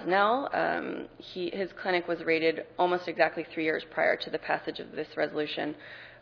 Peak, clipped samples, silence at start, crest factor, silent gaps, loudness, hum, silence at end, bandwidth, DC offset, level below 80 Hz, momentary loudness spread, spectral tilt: -8 dBFS; under 0.1%; 0 s; 22 dB; none; -30 LUFS; none; 0.05 s; 5.4 kHz; under 0.1%; -68 dBFS; 11 LU; -6.5 dB/octave